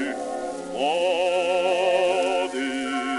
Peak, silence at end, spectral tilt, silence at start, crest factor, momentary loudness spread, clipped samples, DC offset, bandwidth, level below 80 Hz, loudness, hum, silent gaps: -10 dBFS; 0 s; -3 dB/octave; 0 s; 14 dB; 9 LU; under 0.1%; under 0.1%; 11.5 kHz; -62 dBFS; -23 LUFS; none; none